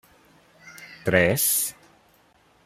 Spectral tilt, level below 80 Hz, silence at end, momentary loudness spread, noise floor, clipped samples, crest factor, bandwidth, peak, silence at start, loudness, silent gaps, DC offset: -3.5 dB/octave; -58 dBFS; 0.95 s; 22 LU; -60 dBFS; under 0.1%; 24 dB; 16 kHz; -4 dBFS; 0.65 s; -22 LUFS; none; under 0.1%